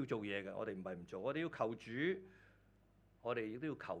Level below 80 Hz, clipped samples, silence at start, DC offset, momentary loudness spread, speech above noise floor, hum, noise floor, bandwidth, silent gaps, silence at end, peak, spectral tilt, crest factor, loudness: -76 dBFS; under 0.1%; 0 s; under 0.1%; 7 LU; 28 dB; none; -70 dBFS; 9.8 kHz; none; 0 s; -24 dBFS; -7 dB/octave; 18 dB; -43 LUFS